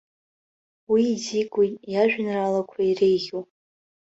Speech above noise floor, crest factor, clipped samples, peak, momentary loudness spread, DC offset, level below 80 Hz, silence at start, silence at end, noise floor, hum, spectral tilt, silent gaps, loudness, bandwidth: over 67 dB; 16 dB; under 0.1%; -8 dBFS; 5 LU; under 0.1%; -66 dBFS; 0.9 s; 0.7 s; under -90 dBFS; none; -5 dB/octave; none; -23 LUFS; 8 kHz